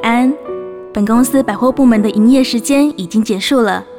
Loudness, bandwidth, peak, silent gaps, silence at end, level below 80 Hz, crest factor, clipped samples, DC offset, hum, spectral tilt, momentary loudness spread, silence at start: -12 LUFS; 17.5 kHz; -2 dBFS; none; 0 s; -46 dBFS; 10 dB; under 0.1%; under 0.1%; none; -5 dB/octave; 10 LU; 0 s